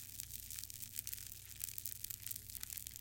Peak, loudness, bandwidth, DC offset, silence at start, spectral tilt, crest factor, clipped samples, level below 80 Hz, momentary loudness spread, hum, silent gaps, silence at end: -14 dBFS; -45 LUFS; 17 kHz; under 0.1%; 0 s; -0.5 dB/octave; 34 dB; under 0.1%; -64 dBFS; 3 LU; none; none; 0 s